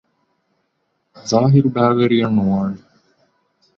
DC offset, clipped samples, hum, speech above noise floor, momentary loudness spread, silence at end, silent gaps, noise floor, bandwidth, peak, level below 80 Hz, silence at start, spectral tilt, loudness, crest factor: under 0.1%; under 0.1%; none; 54 dB; 13 LU; 1 s; none; -69 dBFS; 7.2 kHz; -2 dBFS; -52 dBFS; 1.15 s; -7 dB/octave; -16 LUFS; 16 dB